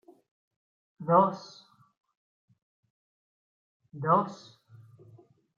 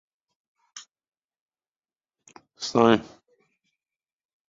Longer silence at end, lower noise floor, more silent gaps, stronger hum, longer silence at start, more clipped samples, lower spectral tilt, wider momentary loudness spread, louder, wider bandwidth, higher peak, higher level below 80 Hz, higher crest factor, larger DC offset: second, 1.2 s vs 1.45 s; second, -58 dBFS vs under -90 dBFS; first, 1.97-2.01 s, 2.17-2.48 s, 2.62-2.83 s, 2.90-3.80 s vs 1.41-1.48 s; neither; first, 1 s vs 0.75 s; neither; first, -8 dB/octave vs -5 dB/octave; about the same, 23 LU vs 25 LU; second, -26 LUFS vs -22 LUFS; about the same, 7.4 kHz vs 7.8 kHz; second, -8 dBFS vs -2 dBFS; second, -82 dBFS vs -66 dBFS; about the same, 24 dB vs 28 dB; neither